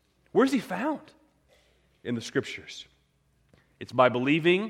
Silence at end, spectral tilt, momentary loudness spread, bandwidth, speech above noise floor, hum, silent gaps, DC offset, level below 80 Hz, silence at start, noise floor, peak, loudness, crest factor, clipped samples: 0 s; -5.5 dB/octave; 19 LU; 14.5 kHz; 42 dB; none; none; under 0.1%; -70 dBFS; 0.35 s; -68 dBFS; -6 dBFS; -27 LUFS; 22 dB; under 0.1%